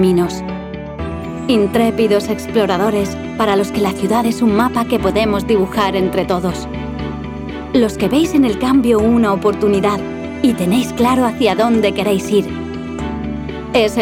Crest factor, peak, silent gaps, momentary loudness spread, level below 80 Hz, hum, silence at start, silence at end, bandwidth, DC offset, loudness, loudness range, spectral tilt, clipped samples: 12 dB; -4 dBFS; none; 11 LU; -36 dBFS; none; 0 s; 0 s; 16.5 kHz; under 0.1%; -16 LUFS; 3 LU; -6 dB/octave; under 0.1%